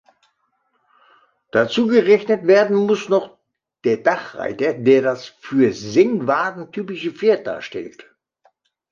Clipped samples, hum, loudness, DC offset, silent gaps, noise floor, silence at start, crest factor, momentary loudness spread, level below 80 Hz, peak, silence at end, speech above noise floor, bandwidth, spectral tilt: under 0.1%; none; -18 LUFS; under 0.1%; none; -68 dBFS; 1.55 s; 18 dB; 14 LU; -64 dBFS; -2 dBFS; 1 s; 50 dB; 7.4 kHz; -6 dB/octave